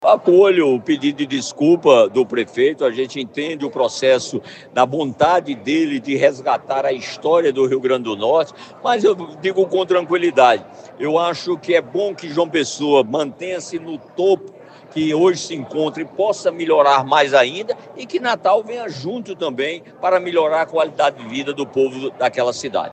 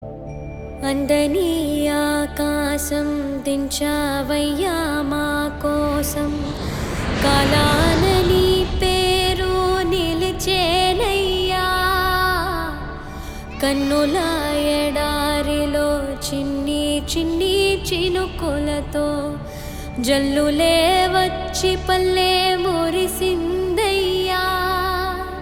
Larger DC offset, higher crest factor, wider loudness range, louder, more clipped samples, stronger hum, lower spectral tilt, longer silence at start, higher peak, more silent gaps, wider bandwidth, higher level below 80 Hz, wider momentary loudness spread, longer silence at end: neither; about the same, 18 dB vs 16 dB; about the same, 3 LU vs 4 LU; about the same, -18 LUFS vs -19 LUFS; neither; neither; about the same, -4.5 dB/octave vs -4.5 dB/octave; about the same, 0 s vs 0 s; first, 0 dBFS vs -4 dBFS; neither; second, 8.8 kHz vs 18.5 kHz; second, -68 dBFS vs -32 dBFS; about the same, 11 LU vs 9 LU; about the same, 0 s vs 0 s